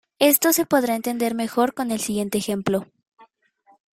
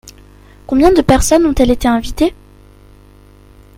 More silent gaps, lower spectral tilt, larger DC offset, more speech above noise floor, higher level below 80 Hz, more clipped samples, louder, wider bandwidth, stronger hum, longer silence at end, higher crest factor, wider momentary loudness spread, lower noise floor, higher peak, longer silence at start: first, 3.08-3.12 s vs none; second, -3.5 dB/octave vs -5 dB/octave; neither; first, 38 dB vs 31 dB; second, -62 dBFS vs -26 dBFS; second, under 0.1% vs 0.1%; second, -21 LUFS vs -12 LUFS; about the same, 16.5 kHz vs 16.5 kHz; second, none vs 50 Hz at -35 dBFS; second, 0.7 s vs 1.45 s; first, 20 dB vs 14 dB; about the same, 8 LU vs 7 LU; first, -60 dBFS vs -42 dBFS; about the same, -2 dBFS vs 0 dBFS; second, 0.2 s vs 0.7 s